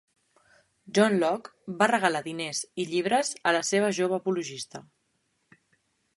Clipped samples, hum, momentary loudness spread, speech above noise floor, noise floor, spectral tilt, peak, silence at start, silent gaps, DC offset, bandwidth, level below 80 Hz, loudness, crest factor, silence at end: under 0.1%; none; 13 LU; 47 dB; -74 dBFS; -3.5 dB/octave; -6 dBFS; 0.85 s; none; under 0.1%; 11.5 kHz; -76 dBFS; -26 LUFS; 22 dB; 1.4 s